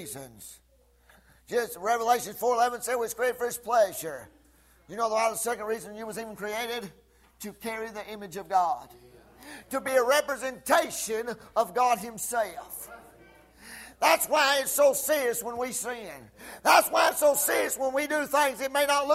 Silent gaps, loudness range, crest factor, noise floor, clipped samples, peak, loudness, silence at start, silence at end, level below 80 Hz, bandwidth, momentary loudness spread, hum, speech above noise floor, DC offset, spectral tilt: none; 8 LU; 22 dB; -61 dBFS; under 0.1%; -8 dBFS; -27 LUFS; 0 s; 0 s; -64 dBFS; 16 kHz; 19 LU; none; 34 dB; under 0.1%; -1.5 dB/octave